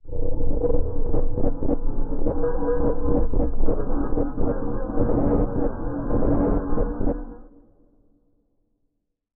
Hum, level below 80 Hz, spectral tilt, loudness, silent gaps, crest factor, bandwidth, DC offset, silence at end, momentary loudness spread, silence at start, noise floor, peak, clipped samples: none; -24 dBFS; -13 dB/octave; -26 LUFS; none; 14 dB; 1.8 kHz; under 0.1%; 1.95 s; 6 LU; 0.05 s; -73 dBFS; -6 dBFS; under 0.1%